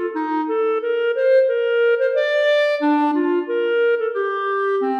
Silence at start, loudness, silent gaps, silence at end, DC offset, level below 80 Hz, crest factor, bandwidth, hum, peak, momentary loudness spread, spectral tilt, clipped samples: 0 s; -19 LUFS; none; 0 s; under 0.1%; -82 dBFS; 10 dB; 6.8 kHz; none; -8 dBFS; 5 LU; -3.5 dB/octave; under 0.1%